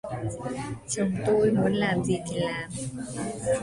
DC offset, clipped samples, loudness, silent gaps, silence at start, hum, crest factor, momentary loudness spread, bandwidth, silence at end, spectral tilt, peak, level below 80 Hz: under 0.1%; under 0.1%; -28 LUFS; none; 0.05 s; none; 16 dB; 11 LU; 11.5 kHz; 0 s; -5.5 dB/octave; -12 dBFS; -52 dBFS